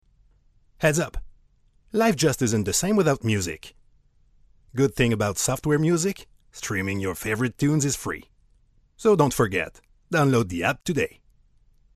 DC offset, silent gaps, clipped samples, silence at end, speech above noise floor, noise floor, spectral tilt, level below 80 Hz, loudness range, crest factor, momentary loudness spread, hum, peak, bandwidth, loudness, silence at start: under 0.1%; none; under 0.1%; 0.9 s; 37 dB; -60 dBFS; -5 dB/octave; -48 dBFS; 2 LU; 20 dB; 12 LU; none; -4 dBFS; 14 kHz; -24 LUFS; 0.8 s